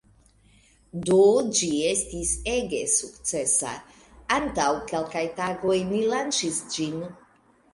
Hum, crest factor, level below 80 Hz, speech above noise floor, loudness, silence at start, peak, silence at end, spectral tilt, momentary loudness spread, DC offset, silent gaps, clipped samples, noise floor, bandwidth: none; 18 dB; -50 dBFS; 35 dB; -24 LUFS; 0.95 s; -8 dBFS; 0.6 s; -3 dB/octave; 13 LU; under 0.1%; none; under 0.1%; -60 dBFS; 11.5 kHz